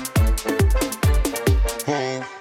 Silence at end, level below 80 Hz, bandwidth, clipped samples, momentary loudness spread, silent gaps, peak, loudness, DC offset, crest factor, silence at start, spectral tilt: 0 s; -22 dBFS; 17 kHz; under 0.1%; 4 LU; none; -8 dBFS; -21 LUFS; under 0.1%; 12 dB; 0 s; -5 dB/octave